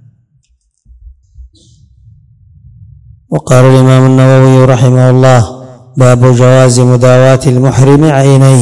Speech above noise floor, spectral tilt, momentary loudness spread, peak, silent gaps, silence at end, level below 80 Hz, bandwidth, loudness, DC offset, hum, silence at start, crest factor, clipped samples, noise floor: 50 dB; -7 dB/octave; 5 LU; 0 dBFS; none; 0 s; -36 dBFS; 12 kHz; -5 LUFS; under 0.1%; none; 1.05 s; 6 dB; 10%; -54 dBFS